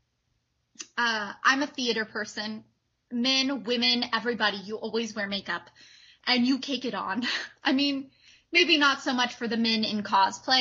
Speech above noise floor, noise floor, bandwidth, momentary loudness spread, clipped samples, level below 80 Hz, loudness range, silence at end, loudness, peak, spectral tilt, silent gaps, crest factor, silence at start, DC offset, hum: 48 dB; -75 dBFS; 7.6 kHz; 11 LU; under 0.1%; -74 dBFS; 4 LU; 0 s; -26 LUFS; -8 dBFS; -2.5 dB/octave; none; 20 dB; 0.8 s; under 0.1%; none